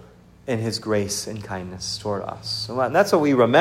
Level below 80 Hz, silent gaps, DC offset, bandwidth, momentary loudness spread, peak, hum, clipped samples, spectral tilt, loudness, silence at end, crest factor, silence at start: -56 dBFS; none; under 0.1%; 16 kHz; 13 LU; -4 dBFS; none; under 0.1%; -4.5 dB/octave; -23 LUFS; 0 s; 18 dB; 0.45 s